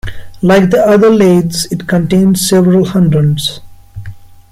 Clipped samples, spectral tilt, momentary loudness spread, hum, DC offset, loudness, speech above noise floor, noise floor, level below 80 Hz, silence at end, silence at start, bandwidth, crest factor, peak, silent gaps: under 0.1%; -6 dB/octave; 14 LU; none; under 0.1%; -10 LUFS; 20 dB; -29 dBFS; -36 dBFS; 0.35 s; 0.05 s; 16 kHz; 10 dB; 0 dBFS; none